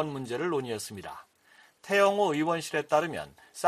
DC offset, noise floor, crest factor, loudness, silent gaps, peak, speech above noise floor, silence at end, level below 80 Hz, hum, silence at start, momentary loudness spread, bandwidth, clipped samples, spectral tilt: under 0.1%; -60 dBFS; 20 dB; -28 LUFS; none; -8 dBFS; 32 dB; 0 s; -70 dBFS; none; 0 s; 18 LU; 14.5 kHz; under 0.1%; -4.5 dB/octave